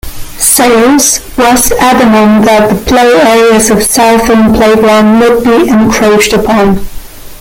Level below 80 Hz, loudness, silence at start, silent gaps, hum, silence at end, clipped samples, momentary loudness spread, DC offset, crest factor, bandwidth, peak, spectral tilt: -26 dBFS; -5 LUFS; 0.05 s; none; none; 0.05 s; 0.3%; 3 LU; under 0.1%; 6 dB; over 20 kHz; 0 dBFS; -3.5 dB/octave